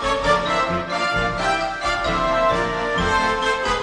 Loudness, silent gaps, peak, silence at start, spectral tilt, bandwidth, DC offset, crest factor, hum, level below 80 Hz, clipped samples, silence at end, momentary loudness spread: -20 LUFS; none; -6 dBFS; 0 s; -4 dB/octave; 10.5 kHz; under 0.1%; 16 dB; none; -36 dBFS; under 0.1%; 0 s; 3 LU